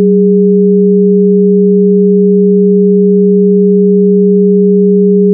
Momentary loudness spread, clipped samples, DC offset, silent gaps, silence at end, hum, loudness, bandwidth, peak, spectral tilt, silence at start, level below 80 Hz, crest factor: 0 LU; under 0.1%; under 0.1%; none; 0 s; none; -7 LUFS; 0.5 kHz; 0 dBFS; -19.5 dB/octave; 0 s; -78 dBFS; 6 dB